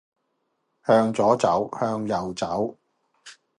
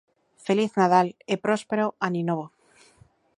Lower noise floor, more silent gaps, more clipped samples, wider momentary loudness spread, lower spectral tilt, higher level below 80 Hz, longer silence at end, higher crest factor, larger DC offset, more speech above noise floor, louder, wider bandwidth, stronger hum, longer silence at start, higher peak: first, -74 dBFS vs -59 dBFS; neither; neither; about the same, 9 LU vs 11 LU; about the same, -6 dB/octave vs -6 dB/octave; first, -60 dBFS vs -72 dBFS; second, 0.25 s vs 0.9 s; about the same, 20 dB vs 22 dB; neither; first, 52 dB vs 35 dB; about the same, -23 LUFS vs -24 LUFS; about the same, 11.5 kHz vs 11 kHz; neither; first, 0.85 s vs 0.45 s; about the same, -4 dBFS vs -4 dBFS